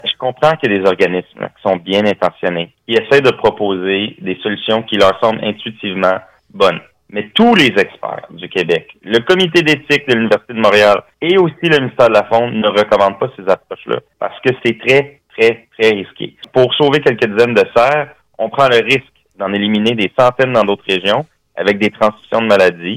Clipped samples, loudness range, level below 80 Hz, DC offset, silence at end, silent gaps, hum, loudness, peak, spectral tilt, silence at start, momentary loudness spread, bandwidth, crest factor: under 0.1%; 3 LU; -52 dBFS; under 0.1%; 0 s; none; none; -13 LUFS; -2 dBFS; -5.5 dB/octave; 0.05 s; 11 LU; 15 kHz; 12 dB